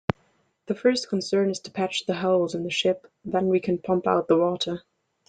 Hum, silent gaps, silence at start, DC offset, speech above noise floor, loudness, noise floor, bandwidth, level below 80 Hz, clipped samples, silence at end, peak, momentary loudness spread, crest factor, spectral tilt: none; none; 0.7 s; under 0.1%; 42 dB; -25 LUFS; -66 dBFS; 9.4 kHz; -62 dBFS; under 0.1%; 0.5 s; -2 dBFS; 9 LU; 22 dB; -5 dB/octave